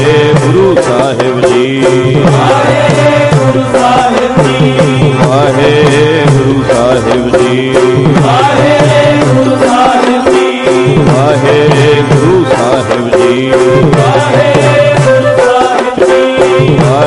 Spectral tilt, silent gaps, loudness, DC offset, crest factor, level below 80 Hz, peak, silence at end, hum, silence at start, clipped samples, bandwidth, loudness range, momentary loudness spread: -6 dB/octave; none; -7 LUFS; under 0.1%; 6 dB; -34 dBFS; 0 dBFS; 0 s; none; 0 s; 0.2%; 11.5 kHz; 0 LU; 2 LU